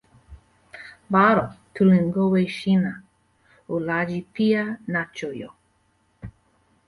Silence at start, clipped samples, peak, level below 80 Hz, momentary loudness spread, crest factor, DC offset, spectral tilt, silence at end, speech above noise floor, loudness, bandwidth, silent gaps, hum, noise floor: 0.3 s; under 0.1%; -4 dBFS; -56 dBFS; 24 LU; 18 dB; under 0.1%; -8 dB/octave; 0.55 s; 44 dB; -22 LUFS; 11 kHz; none; none; -65 dBFS